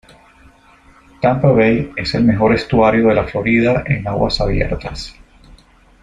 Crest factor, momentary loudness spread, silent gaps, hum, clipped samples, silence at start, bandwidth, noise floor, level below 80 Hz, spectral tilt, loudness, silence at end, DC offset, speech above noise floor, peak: 16 dB; 9 LU; none; none; under 0.1%; 1.2 s; 10 kHz; -47 dBFS; -32 dBFS; -7.5 dB/octave; -15 LUFS; 0.9 s; under 0.1%; 33 dB; 0 dBFS